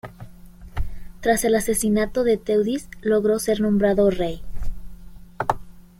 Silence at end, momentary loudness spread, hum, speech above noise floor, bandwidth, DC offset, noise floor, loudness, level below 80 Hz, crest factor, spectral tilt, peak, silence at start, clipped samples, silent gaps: 0.2 s; 17 LU; none; 22 dB; 16.5 kHz; under 0.1%; -42 dBFS; -21 LUFS; -36 dBFS; 18 dB; -5 dB/octave; -4 dBFS; 0.05 s; under 0.1%; none